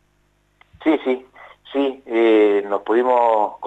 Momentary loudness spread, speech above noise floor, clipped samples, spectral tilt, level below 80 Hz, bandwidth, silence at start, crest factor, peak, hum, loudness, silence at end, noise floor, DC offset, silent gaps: 10 LU; 45 dB; under 0.1%; -6 dB/octave; -64 dBFS; 8 kHz; 0.8 s; 14 dB; -6 dBFS; 50 Hz at -60 dBFS; -18 LUFS; 0 s; -62 dBFS; under 0.1%; none